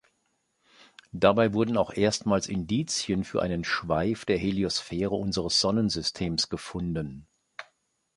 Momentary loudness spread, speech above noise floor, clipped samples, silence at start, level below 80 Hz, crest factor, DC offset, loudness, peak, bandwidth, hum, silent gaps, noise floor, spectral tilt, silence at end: 10 LU; 47 dB; under 0.1%; 1.15 s; -50 dBFS; 24 dB; under 0.1%; -27 LUFS; -4 dBFS; 11.5 kHz; none; none; -74 dBFS; -4.5 dB/octave; 0.55 s